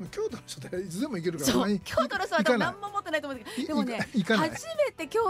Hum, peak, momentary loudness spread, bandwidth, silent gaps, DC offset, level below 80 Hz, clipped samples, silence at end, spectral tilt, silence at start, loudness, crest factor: none; -12 dBFS; 9 LU; 16 kHz; none; under 0.1%; -58 dBFS; under 0.1%; 0 s; -4.5 dB/octave; 0 s; -29 LUFS; 16 dB